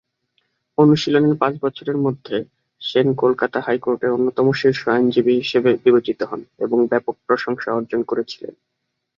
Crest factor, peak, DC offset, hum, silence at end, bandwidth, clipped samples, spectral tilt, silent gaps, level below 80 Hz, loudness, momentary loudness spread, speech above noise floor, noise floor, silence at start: 18 dB; -2 dBFS; under 0.1%; none; 0.65 s; 7.2 kHz; under 0.1%; -7 dB/octave; none; -62 dBFS; -19 LUFS; 11 LU; 50 dB; -68 dBFS; 0.8 s